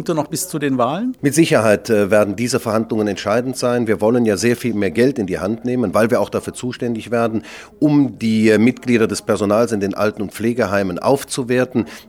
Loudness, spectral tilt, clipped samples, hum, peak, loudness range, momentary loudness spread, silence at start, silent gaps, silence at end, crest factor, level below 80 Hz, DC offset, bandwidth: -17 LUFS; -5.5 dB/octave; under 0.1%; none; -2 dBFS; 2 LU; 7 LU; 0 s; none; 0.05 s; 14 dB; -54 dBFS; under 0.1%; 17 kHz